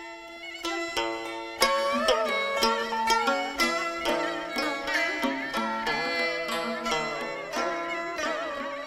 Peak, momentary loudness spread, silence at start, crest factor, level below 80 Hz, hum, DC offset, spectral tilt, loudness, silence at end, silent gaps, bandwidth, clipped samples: -4 dBFS; 8 LU; 0 s; 24 dB; -56 dBFS; none; under 0.1%; -2 dB/octave; -27 LUFS; 0 s; none; 16.5 kHz; under 0.1%